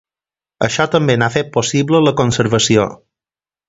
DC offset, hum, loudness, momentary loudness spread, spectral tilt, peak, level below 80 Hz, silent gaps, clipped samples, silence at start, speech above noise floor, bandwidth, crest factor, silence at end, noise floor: under 0.1%; none; -15 LUFS; 5 LU; -4.5 dB/octave; 0 dBFS; -48 dBFS; none; under 0.1%; 0.6 s; over 76 dB; 8 kHz; 16 dB; 0.75 s; under -90 dBFS